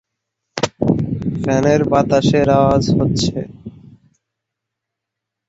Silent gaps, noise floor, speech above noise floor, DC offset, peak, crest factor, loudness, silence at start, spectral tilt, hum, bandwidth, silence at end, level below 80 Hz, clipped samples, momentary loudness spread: none; -81 dBFS; 67 dB; under 0.1%; 0 dBFS; 16 dB; -16 LUFS; 0.55 s; -6.5 dB/octave; none; 8 kHz; 1.8 s; -40 dBFS; under 0.1%; 13 LU